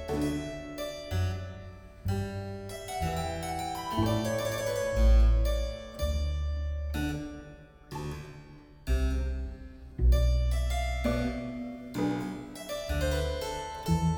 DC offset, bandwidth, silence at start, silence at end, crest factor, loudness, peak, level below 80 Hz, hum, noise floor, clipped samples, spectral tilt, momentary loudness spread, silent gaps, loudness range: under 0.1%; 19 kHz; 0 s; 0 s; 16 dB; -32 LUFS; -14 dBFS; -32 dBFS; none; -50 dBFS; under 0.1%; -6 dB/octave; 16 LU; none; 6 LU